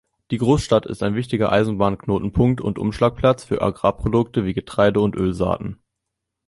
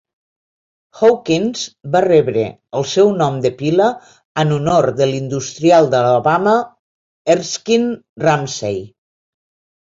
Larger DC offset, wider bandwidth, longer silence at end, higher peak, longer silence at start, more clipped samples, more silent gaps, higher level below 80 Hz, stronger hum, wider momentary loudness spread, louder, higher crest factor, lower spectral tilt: neither; first, 11.5 kHz vs 7.8 kHz; second, 0.75 s vs 1 s; about the same, -2 dBFS vs -2 dBFS; second, 0.3 s vs 0.95 s; neither; second, none vs 4.25-4.35 s, 6.79-7.25 s, 8.09-8.16 s; first, -40 dBFS vs -54 dBFS; neither; second, 6 LU vs 10 LU; second, -20 LUFS vs -16 LUFS; about the same, 18 dB vs 14 dB; first, -7 dB/octave vs -5.5 dB/octave